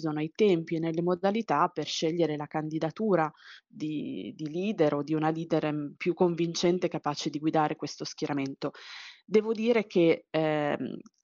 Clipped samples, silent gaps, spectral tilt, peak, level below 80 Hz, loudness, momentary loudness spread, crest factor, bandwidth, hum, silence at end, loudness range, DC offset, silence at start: under 0.1%; none; -5 dB/octave; -12 dBFS; -74 dBFS; -29 LUFS; 10 LU; 18 dB; 7.4 kHz; none; 0.25 s; 2 LU; under 0.1%; 0 s